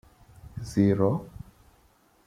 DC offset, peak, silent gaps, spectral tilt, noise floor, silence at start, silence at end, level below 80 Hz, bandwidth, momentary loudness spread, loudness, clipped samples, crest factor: under 0.1%; -10 dBFS; none; -8.5 dB/octave; -62 dBFS; 0.45 s; 0.85 s; -54 dBFS; 13.5 kHz; 23 LU; -26 LUFS; under 0.1%; 20 dB